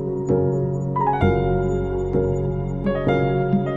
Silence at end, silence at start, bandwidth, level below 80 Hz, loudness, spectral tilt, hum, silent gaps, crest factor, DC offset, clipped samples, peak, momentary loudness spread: 0 s; 0 s; 7.4 kHz; -34 dBFS; -21 LUFS; -9 dB/octave; none; none; 16 dB; under 0.1%; under 0.1%; -4 dBFS; 4 LU